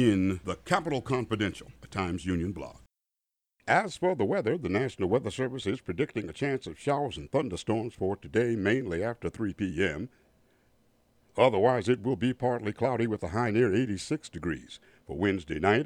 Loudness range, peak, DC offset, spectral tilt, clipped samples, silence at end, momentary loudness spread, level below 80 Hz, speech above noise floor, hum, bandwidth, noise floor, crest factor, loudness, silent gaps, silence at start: 4 LU; -8 dBFS; under 0.1%; -6.5 dB/octave; under 0.1%; 0 s; 10 LU; -56 dBFS; 59 dB; none; 12.5 kHz; -88 dBFS; 22 dB; -30 LUFS; none; 0 s